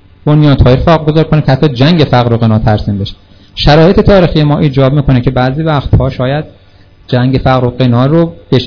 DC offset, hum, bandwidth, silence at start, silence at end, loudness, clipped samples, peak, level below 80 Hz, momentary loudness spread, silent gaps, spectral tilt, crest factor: 1%; none; 5.4 kHz; 0.25 s; 0 s; -9 LUFS; 6%; 0 dBFS; -22 dBFS; 8 LU; none; -8.5 dB/octave; 8 dB